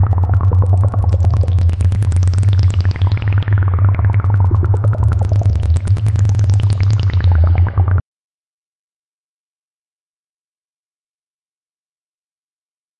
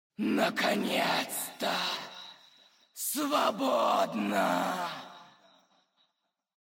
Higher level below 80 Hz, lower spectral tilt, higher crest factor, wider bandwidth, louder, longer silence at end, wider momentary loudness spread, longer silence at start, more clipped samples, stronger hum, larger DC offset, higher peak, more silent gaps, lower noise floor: first, -28 dBFS vs -86 dBFS; first, -8 dB/octave vs -3 dB/octave; second, 10 dB vs 16 dB; second, 9 kHz vs 16.5 kHz; first, -14 LUFS vs -30 LUFS; first, 5 s vs 1.35 s; second, 2 LU vs 16 LU; second, 0 s vs 0.2 s; neither; neither; neither; first, -4 dBFS vs -16 dBFS; neither; first, under -90 dBFS vs -81 dBFS